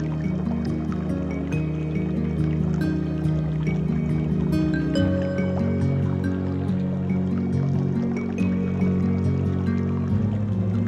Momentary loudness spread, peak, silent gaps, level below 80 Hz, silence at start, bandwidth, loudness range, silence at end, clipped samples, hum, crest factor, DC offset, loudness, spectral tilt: 3 LU; -10 dBFS; none; -40 dBFS; 0 s; 8 kHz; 1 LU; 0 s; under 0.1%; none; 12 dB; under 0.1%; -24 LUFS; -9 dB/octave